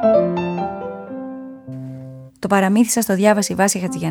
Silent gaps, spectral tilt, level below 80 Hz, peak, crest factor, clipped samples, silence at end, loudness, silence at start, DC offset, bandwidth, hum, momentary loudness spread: none; -5 dB/octave; -54 dBFS; -2 dBFS; 16 dB; under 0.1%; 0 s; -17 LUFS; 0 s; under 0.1%; 19.5 kHz; none; 18 LU